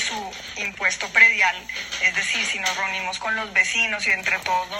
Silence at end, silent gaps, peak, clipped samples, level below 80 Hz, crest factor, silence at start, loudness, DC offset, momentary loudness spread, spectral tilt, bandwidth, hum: 0 s; none; -2 dBFS; under 0.1%; -56 dBFS; 20 dB; 0 s; -20 LUFS; under 0.1%; 14 LU; 0 dB/octave; 16 kHz; none